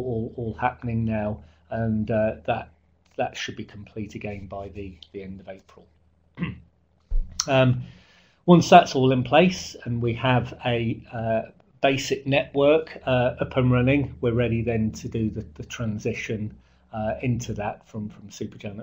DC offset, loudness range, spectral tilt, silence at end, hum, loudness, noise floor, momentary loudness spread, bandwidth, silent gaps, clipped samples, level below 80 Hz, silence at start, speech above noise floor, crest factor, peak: under 0.1%; 15 LU; -6 dB/octave; 0 s; none; -24 LUFS; -60 dBFS; 18 LU; 16 kHz; none; under 0.1%; -40 dBFS; 0 s; 36 dB; 24 dB; 0 dBFS